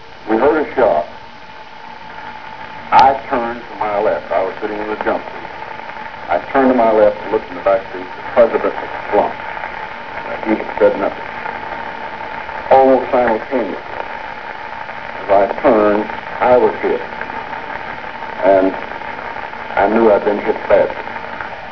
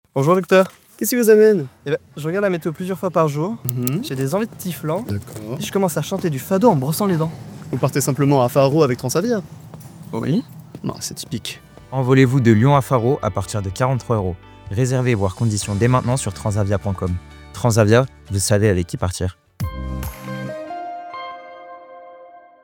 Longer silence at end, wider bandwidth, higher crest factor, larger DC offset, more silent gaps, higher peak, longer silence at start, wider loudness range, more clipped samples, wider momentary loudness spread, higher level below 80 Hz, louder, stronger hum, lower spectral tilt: second, 0 s vs 0.25 s; second, 5.4 kHz vs over 20 kHz; about the same, 16 dB vs 20 dB; first, 1% vs under 0.1%; neither; about the same, 0 dBFS vs 0 dBFS; second, 0 s vs 0.15 s; about the same, 4 LU vs 5 LU; neither; about the same, 16 LU vs 16 LU; about the same, -46 dBFS vs -44 dBFS; first, -16 LUFS vs -19 LUFS; neither; about the same, -7 dB/octave vs -6 dB/octave